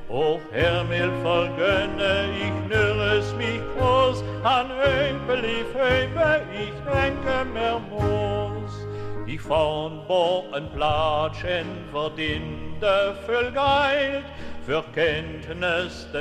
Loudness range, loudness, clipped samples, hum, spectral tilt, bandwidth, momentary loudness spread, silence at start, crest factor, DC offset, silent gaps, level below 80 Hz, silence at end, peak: 3 LU; -24 LUFS; under 0.1%; none; -6 dB/octave; 11.5 kHz; 10 LU; 0 s; 16 dB; under 0.1%; none; -42 dBFS; 0 s; -8 dBFS